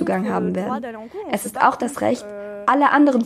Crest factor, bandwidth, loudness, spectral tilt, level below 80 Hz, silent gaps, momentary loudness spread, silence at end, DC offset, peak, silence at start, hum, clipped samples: 18 dB; 16 kHz; -20 LUFS; -5.5 dB/octave; -60 dBFS; none; 14 LU; 0 s; under 0.1%; -2 dBFS; 0 s; none; under 0.1%